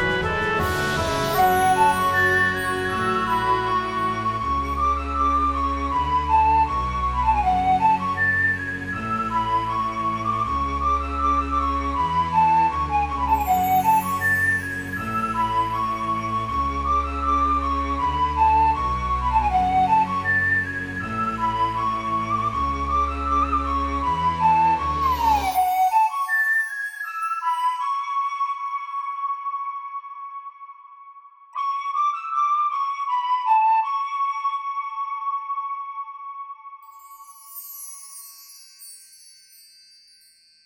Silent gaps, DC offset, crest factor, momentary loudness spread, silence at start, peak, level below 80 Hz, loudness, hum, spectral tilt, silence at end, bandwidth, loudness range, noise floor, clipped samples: none; under 0.1%; 16 dB; 12 LU; 0 s; -8 dBFS; -36 dBFS; -22 LUFS; none; -5 dB/octave; 1.35 s; 19 kHz; 10 LU; -55 dBFS; under 0.1%